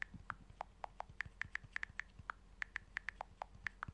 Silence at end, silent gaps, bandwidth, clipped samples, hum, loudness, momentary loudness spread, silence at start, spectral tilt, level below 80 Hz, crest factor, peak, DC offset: 0 s; none; 11 kHz; under 0.1%; none; -49 LUFS; 7 LU; 0 s; -4 dB/octave; -62 dBFS; 26 dB; -24 dBFS; under 0.1%